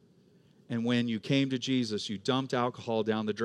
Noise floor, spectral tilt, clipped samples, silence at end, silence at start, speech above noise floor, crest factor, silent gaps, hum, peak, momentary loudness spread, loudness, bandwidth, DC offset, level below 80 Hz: -62 dBFS; -5.5 dB/octave; under 0.1%; 0 s; 0.7 s; 32 dB; 18 dB; none; none; -14 dBFS; 5 LU; -31 LUFS; 10.5 kHz; under 0.1%; -80 dBFS